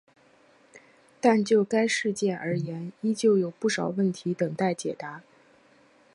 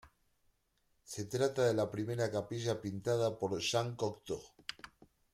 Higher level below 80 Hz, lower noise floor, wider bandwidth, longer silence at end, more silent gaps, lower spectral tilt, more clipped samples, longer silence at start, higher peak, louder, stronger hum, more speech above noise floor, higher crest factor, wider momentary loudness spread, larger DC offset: about the same, -74 dBFS vs -70 dBFS; second, -59 dBFS vs -77 dBFS; second, 11.5 kHz vs 15.5 kHz; first, 0.95 s vs 0.45 s; neither; about the same, -5.5 dB/octave vs -5 dB/octave; neither; first, 0.75 s vs 0.05 s; first, -8 dBFS vs -20 dBFS; first, -26 LUFS vs -36 LUFS; neither; second, 34 dB vs 42 dB; about the same, 20 dB vs 18 dB; second, 11 LU vs 15 LU; neither